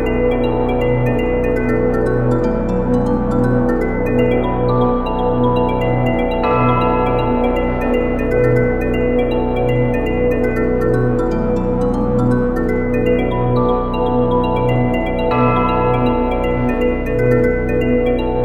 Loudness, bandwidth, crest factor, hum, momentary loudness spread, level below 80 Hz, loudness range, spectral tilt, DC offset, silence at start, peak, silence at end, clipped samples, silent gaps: -16 LUFS; 8 kHz; 14 dB; 60 Hz at -45 dBFS; 3 LU; -24 dBFS; 1 LU; -9 dB/octave; under 0.1%; 0 s; -2 dBFS; 0 s; under 0.1%; none